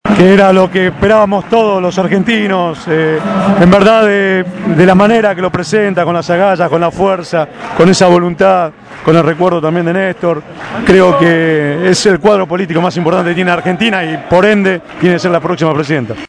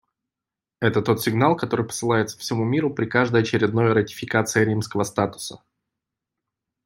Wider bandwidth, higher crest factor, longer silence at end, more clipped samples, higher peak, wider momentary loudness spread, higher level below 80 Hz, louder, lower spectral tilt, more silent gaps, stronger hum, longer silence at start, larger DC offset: second, 11 kHz vs 16.5 kHz; second, 10 dB vs 20 dB; second, 0.05 s vs 1.3 s; first, 2% vs under 0.1%; first, 0 dBFS vs -4 dBFS; about the same, 8 LU vs 6 LU; first, -40 dBFS vs -62 dBFS; first, -10 LUFS vs -22 LUFS; about the same, -6 dB/octave vs -5.5 dB/octave; neither; neither; second, 0.05 s vs 0.8 s; neither